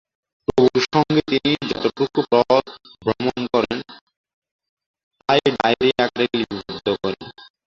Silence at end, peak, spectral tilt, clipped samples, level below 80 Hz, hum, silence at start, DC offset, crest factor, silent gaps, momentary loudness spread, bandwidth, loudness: 0.3 s; -2 dBFS; -5.5 dB/octave; under 0.1%; -52 dBFS; none; 0.55 s; under 0.1%; 20 dB; 4.01-4.07 s, 4.17-4.24 s, 4.34-4.42 s, 4.51-4.59 s, 4.69-4.77 s, 4.86-4.94 s, 5.03-5.11 s; 11 LU; 7.4 kHz; -20 LUFS